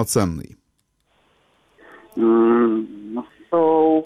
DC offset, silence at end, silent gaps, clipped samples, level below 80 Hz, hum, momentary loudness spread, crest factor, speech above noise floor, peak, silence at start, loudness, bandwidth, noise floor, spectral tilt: under 0.1%; 0 s; none; under 0.1%; -52 dBFS; none; 17 LU; 14 dB; 51 dB; -6 dBFS; 0 s; -19 LUFS; 14.5 kHz; -68 dBFS; -6 dB/octave